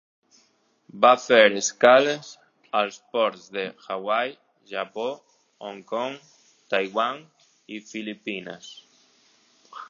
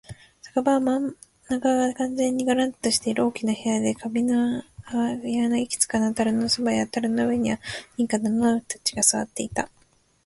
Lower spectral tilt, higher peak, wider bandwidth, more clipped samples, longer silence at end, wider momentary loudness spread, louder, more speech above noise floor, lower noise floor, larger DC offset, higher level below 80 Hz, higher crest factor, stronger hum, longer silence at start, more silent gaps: about the same, -2.5 dB/octave vs -3.5 dB/octave; first, -2 dBFS vs -6 dBFS; second, 7.6 kHz vs 12 kHz; neither; second, 0.05 s vs 0.6 s; first, 23 LU vs 8 LU; about the same, -23 LUFS vs -24 LUFS; first, 42 dB vs 21 dB; first, -65 dBFS vs -45 dBFS; neither; second, -82 dBFS vs -56 dBFS; about the same, 24 dB vs 20 dB; neither; first, 0.95 s vs 0.1 s; neither